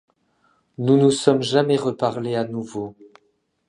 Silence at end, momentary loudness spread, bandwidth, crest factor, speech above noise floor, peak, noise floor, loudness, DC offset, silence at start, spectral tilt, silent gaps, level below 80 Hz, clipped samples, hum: 0.65 s; 14 LU; 11 kHz; 20 dB; 47 dB; -2 dBFS; -67 dBFS; -20 LUFS; under 0.1%; 0.8 s; -6 dB/octave; none; -64 dBFS; under 0.1%; none